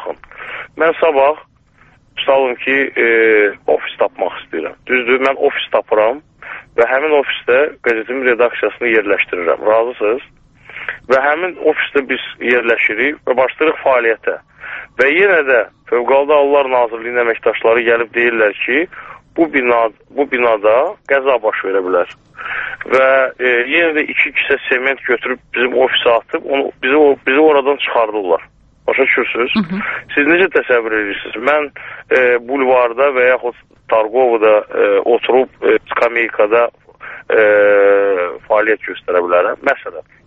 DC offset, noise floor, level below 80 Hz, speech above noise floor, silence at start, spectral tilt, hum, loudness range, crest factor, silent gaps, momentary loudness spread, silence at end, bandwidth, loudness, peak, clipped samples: under 0.1%; -49 dBFS; -54 dBFS; 36 dB; 0 s; -6 dB/octave; none; 2 LU; 14 dB; none; 11 LU; 0.25 s; 6 kHz; -14 LUFS; 0 dBFS; under 0.1%